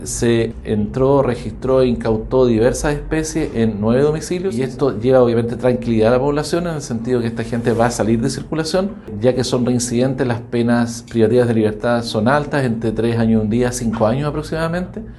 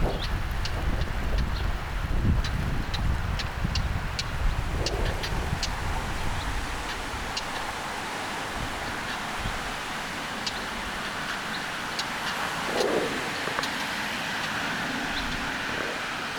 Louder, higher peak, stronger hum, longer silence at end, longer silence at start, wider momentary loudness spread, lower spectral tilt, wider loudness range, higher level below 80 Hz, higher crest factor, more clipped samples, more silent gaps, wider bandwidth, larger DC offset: first, -17 LUFS vs -30 LUFS; first, 0 dBFS vs -10 dBFS; neither; about the same, 0 s vs 0 s; about the same, 0 s vs 0 s; about the same, 6 LU vs 4 LU; first, -6 dB/octave vs -4 dB/octave; about the same, 2 LU vs 3 LU; about the same, -36 dBFS vs -34 dBFS; about the same, 16 dB vs 18 dB; neither; neither; second, 12.5 kHz vs over 20 kHz; neither